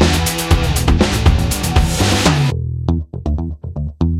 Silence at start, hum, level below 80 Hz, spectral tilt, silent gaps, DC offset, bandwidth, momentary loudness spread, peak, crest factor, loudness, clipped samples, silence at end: 0 s; none; -20 dBFS; -5 dB/octave; none; under 0.1%; 16.5 kHz; 9 LU; 0 dBFS; 14 dB; -16 LUFS; under 0.1%; 0 s